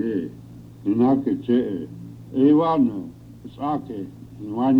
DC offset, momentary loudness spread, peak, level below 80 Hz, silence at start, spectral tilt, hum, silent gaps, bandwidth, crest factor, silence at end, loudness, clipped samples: under 0.1%; 22 LU; -8 dBFS; -56 dBFS; 0 s; -9.5 dB/octave; none; none; 5.2 kHz; 16 dB; 0 s; -22 LUFS; under 0.1%